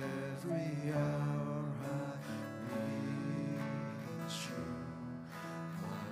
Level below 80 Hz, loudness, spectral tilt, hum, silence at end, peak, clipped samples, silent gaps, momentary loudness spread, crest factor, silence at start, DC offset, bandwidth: -72 dBFS; -40 LUFS; -6.5 dB/octave; none; 0 s; -24 dBFS; under 0.1%; none; 8 LU; 16 dB; 0 s; under 0.1%; 15.5 kHz